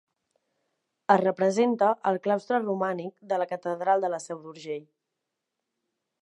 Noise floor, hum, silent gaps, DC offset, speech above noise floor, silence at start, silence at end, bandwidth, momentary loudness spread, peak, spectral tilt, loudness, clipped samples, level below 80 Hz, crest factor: -84 dBFS; none; none; under 0.1%; 58 dB; 1.1 s; 1.4 s; 11.5 kHz; 14 LU; -6 dBFS; -6 dB/octave; -26 LUFS; under 0.1%; -84 dBFS; 22 dB